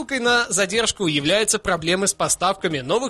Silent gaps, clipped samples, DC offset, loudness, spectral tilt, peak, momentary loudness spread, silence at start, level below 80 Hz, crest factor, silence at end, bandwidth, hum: none; under 0.1%; under 0.1%; -19 LUFS; -2.5 dB/octave; -6 dBFS; 3 LU; 0 s; -48 dBFS; 14 dB; 0 s; 13 kHz; none